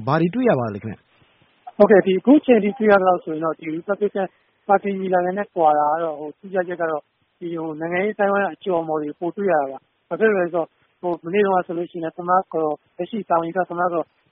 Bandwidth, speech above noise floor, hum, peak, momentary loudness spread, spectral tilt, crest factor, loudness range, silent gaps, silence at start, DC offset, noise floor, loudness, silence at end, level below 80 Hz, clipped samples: 4.3 kHz; 38 dB; none; 0 dBFS; 14 LU; -6 dB/octave; 20 dB; 5 LU; none; 0 s; under 0.1%; -58 dBFS; -20 LUFS; 0.3 s; -64 dBFS; under 0.1%